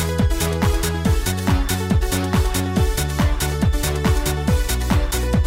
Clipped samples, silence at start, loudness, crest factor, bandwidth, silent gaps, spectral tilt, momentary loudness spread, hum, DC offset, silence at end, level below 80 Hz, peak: under 0.1%; 0 s; -20 LUFS; 12 dB; 16.5 kHz; none; -5 dB/octave; 1 LU; none; under 0.1%; 0 s; -22 dBFS; -8 dBFS